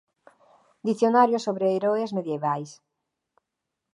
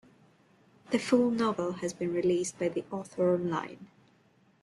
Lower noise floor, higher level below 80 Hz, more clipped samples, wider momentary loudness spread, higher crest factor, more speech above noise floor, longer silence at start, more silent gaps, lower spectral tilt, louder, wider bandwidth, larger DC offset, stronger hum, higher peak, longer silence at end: first, -84 dBFS vs -65 dBFS; second, -82 dBFS vs -70 dBFS; neither; about the same, 12 LU vs 10 LU; about the same, 20 dB vs 20 dB; first, 60 dB vs 36 dB; about the same, 0.85 s vs 0.9 s; neither; about the same, -6.5 dB/octave vs -5.5 dB/octave; first, -24 LUFS vs -30 LUFS; about the same, 11.5 kHz vs 12 kHz; neither; neither; first, -6 dBFS vs -12 dBFS; first, 1.2 s vs 0.75 s